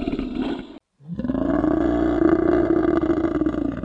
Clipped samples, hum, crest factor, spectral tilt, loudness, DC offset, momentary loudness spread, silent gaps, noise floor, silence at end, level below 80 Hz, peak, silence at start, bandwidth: under 0.1%; none; 16 dB; -9 dB/octave; -21 LUFS; under 0.1%; 11 LU; none; -41 dBFS; 0 s; -38 dBFS; -4 dBFS; 0 s; 7.2 kHz